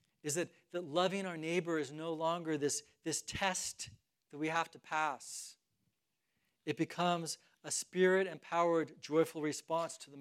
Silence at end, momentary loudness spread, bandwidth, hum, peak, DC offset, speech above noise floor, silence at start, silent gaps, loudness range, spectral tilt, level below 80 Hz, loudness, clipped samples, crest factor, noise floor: 0 s; 11 LU; 15.5 kHz; none; -18 dBFS; under 0.1%; 48 dB; 0.25 s; none; 5 LU; -3.5 dB/octave; -76 dBFS; -37 LUFS; under 0.1%; 20 dB; -85 dBFS